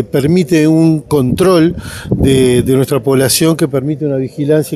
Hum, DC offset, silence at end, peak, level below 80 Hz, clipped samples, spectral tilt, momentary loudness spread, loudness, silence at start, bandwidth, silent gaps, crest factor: none; under 0.1%; 0 s; 0 dBFS; -34 dBFS; under 0.1%; -6 dB/octave; 7 LU; -11 LUFS; 0 s; 15.5 kHz; none; 10 dB